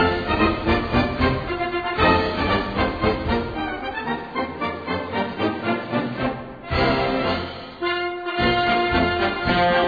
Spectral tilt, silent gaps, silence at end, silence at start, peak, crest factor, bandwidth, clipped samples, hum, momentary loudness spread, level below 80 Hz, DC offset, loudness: -7.5 dB/octave; none; 0 s; 0 s; -4 dBFS; 18 dB; 5 kHz; under 0.1%; none; 8 LU; -36 dBFS; under 0.1%; -22 LUFS